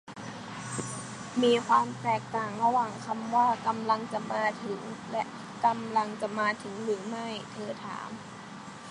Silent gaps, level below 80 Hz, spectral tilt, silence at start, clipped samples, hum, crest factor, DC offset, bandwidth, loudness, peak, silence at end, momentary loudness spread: none; -70 dBFS; -4.5 dB/octave; 0.05 s; under 0.1%; none; 20 dB; under 0.1%; 11 kHz; -30 LUFS; -10 dBFS; 0 s; 14 LU